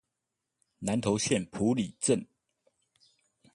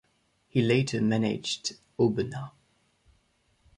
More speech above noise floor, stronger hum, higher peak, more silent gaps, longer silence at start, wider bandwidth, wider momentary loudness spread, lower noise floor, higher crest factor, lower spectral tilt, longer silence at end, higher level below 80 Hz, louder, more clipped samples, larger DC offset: first, 57 dB vs 43 dB; neither; about the same, -12 dBFS vs -10 dBFS; neither; first, 0.8 s vs 0.55 s; about the same, 11.5 kHz vs 11.5 kHz; second, 4 LU vs 11 LU; first, -86 dBFS vs -70 dBFS; about the same, 20 dB vs 20 dB; about the same, -4.5 dB/octave vs -5.5 dB/octave; about the same, 1.3 s vs 1.3 s; about the same, -62 dBFS vs -62 dBFS; about the same, -30 LUFS vs -28 LUFS; neither; neither